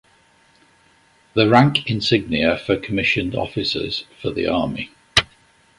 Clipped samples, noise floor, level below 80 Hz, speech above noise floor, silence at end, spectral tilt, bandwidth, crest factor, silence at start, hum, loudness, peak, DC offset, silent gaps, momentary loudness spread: under 0.1%; -56 dBFS; -46 dBFS; 37 dB; 0.55 s; -5.5 dB/octave; 11.5 kHz; 20 dB; 1.35 s; none; -19 LUFS; 0 dBFS; under 0.1%; none; 11 LU